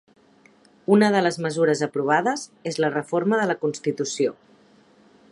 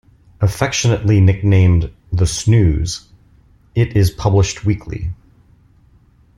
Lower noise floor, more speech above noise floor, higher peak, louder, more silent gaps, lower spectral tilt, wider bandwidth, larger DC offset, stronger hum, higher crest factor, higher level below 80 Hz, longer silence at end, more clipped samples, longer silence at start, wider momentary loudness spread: first, -56 dBFS vs -50 dBFS; about the same, 34 dB vs 36 dB; second, -4 dBFS vs 0 dBFS; second, -22 LUFS vs -16 LUFS; neither; about the same, -5 dB/octave vs -6 dB/octave; about the same, 11.5 kHz vs 12.5 kHz; neither; neither; about the same, 20 dB vs 16 dB; second, -72 dBFS vs -32 dBFS; second, 1 s vs 1.25 s; neither; first, 0.9 s vs 0.4 s; second, 8 LU vs 12 LU